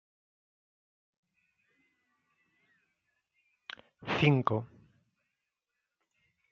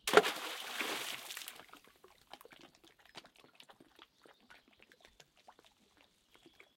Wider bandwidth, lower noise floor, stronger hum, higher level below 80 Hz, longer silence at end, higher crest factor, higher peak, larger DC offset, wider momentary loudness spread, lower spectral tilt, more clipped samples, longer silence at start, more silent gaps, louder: second, 7 kHz vs 16.5 kHz; first, -87 dBFS vs -70 dBFS; neither; first, -72 dBFS vs -80 dBFS; second, 1.85 s vs 2.25 s; second, 28 dB vs 34 dB; second, -10 dBFS vs -6 dBFS; neither; about the same, 23 LU vs 24 LU; first, -5 dB/octave vs -1.5 dB/octave; neither; first, 4 s vs 0.05 s; neither; first, -29 LUFS vs -36 LUFS